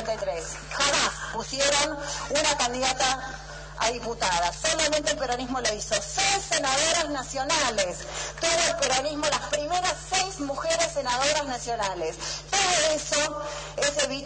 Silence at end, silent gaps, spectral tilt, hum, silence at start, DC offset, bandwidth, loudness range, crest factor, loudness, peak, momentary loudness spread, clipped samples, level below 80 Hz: 0 s; none; -1 dB/octave; none; 0 s; under 0.1%; 10 kHz; 2 LU; 16 dB; -25 LUFS; -12 dBFS; 9 LU; under 0.1%; -46 dBFS